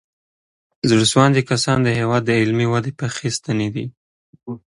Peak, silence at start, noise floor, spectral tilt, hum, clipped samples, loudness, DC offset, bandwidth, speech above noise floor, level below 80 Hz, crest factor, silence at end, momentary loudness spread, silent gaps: 0 dBFS; 0.85 s; under -90 dBFS; -5 dB/octave; none; under 0.1%; -18 LUFS; under 0.1%; 11.5 kHz; over 73 dB; -52 dBFS; 18 dB; 0.1 s; 11 LU; 3.97-4.33 s